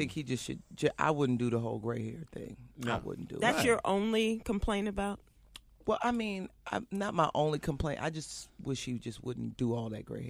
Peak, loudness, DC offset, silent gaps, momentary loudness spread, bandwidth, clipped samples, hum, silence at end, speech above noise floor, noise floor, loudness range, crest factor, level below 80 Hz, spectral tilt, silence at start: -14 dBFS; -34 LUFS; under 0.1%; none; 12 LU; 16 kHz; under 0.1%; none; 0 s; 23 dB; -57 dBFS; 3 LU; 20 dB; -52 dBFS; -5.5 dB/octave; 0 s